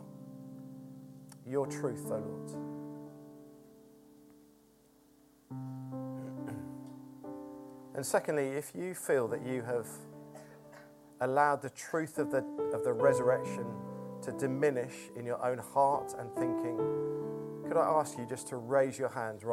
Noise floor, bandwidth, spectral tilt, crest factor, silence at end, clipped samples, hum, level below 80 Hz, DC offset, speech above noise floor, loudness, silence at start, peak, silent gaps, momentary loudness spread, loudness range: -64 dBFS; 16.5 kHz; -6 dB/octave; 22 dB; 0 s; under 0.1%; none; -76 dBFS; under 0.1%; 31 dB; -34 LUFS; 0 s; -14 dBFS; none; 20 LU; 14 LU